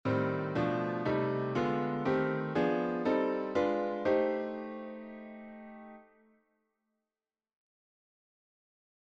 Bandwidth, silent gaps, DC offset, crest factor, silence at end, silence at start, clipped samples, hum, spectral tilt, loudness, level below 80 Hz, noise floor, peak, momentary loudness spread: 7.8 kHz; none; under 0.1%; 16 dB; 3.05 s; 0.05 s; under 0.1%; none; -8 dB/octave; -32 LUFS; -68 dBFS; under -90 dBFS; -18 dBFS; 17 LU